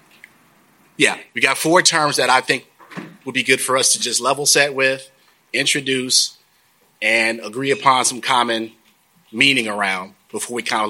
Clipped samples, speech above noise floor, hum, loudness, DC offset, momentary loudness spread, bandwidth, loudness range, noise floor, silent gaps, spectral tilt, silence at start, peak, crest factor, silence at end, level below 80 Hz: under 0.1%; 40 dB; none; -17 LUFS; under 0.1%; 13 LU; 17 kHz; 2 LU; -58 dBFS; none; -1.5 dB/octave; 1 s; 0 dBFS; 20 dB; 0 s; -70 dBFS